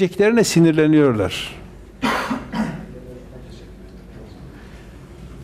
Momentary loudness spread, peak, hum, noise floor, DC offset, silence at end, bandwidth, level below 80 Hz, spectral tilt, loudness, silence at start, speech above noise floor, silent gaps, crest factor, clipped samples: 26 LU; -6 dBFS; none; -39 dBFS; under 0.1%; 0 s; 15.5 kHz; -44 dBFS; -5.5 dB/octave; -18 LUFS; 0 s; 24 dB; none; 16 dB; under 0.1%